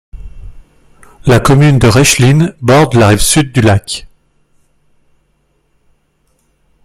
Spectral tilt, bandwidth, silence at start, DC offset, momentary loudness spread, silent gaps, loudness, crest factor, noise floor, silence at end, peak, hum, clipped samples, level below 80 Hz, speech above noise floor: -5 dB/octave; 16 kHz; 0.15 s; under 0.1%; 8 LU; none; -8 LUFS; 12 dB; -58 dBFS; 2.8 s; 0 dBFS; none; under 0.1%; -30 dBFS; 50 dB